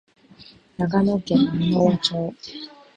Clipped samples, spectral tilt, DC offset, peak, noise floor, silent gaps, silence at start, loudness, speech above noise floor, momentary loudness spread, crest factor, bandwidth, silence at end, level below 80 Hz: under 0.1%; -7 dB/octave; under 0.1%; -4 dBFS; -49 dBFS; none; 0.4 s; -21 LUFS; 28 dB; 17 LU; 18 dB; 8.8 kHz; 0.3 s; -54 dBFS